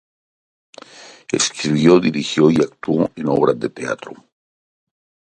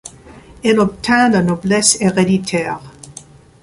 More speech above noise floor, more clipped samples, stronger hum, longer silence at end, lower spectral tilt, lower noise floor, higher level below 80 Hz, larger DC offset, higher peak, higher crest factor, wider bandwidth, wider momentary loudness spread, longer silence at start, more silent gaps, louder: about the same, 25 dB vs 26 dB; neither; neither; first, 1.15 s vs 0.45 s; about the same, -5 dB/octave vs -4 dB/octave; about the same, -42 dBFS vs -40 dBFS; second, -56 dBFS vs -46 dBFS; neither; about the same, 0 dBFS vs 0 dBFS; about the same, 18 dB vs 16 dB; about the same, 10.5 kHz vs 11.5 kHz; second, 13 LU vs 23 LU; first, 1 s vs 0.05 s; neither; second, -17 LUFS vs -14 LUFS